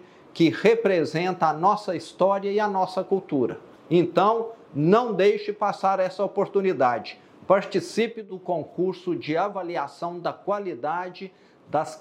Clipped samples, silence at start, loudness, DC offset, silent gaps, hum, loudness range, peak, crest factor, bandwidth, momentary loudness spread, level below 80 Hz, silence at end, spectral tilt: under 0.1%; 0.35 s; -24 LUFS; under 0.1%; none; none; 6 LU; -4 dBFS; 20 dB; 11 kHz; 11 LU; -74 dBFS; 0 s; -6.5 dB/octave